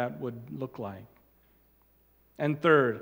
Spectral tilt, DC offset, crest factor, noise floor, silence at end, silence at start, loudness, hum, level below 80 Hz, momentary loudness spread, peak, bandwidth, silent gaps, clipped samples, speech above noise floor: -8 dB/octave; under 0.1%; 22 dB; -65 dBFS; 0 s; 0 s; -29 LUFS; none; -70 dBFS; 18 LU; -10 dBFS; 16.5 kHz; none; under 0.1%; 36 dB